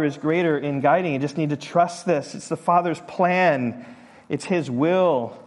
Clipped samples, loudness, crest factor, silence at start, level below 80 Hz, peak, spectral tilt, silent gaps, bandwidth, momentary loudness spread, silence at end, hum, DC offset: under 0.1%; -22 LUFS; 16 dB; 0 s; -68 dBFS; -6 dBFS; -6.5 dB/octave; none; 11.5 kHz; 9 LU; 0.05 s; none; under 0.1%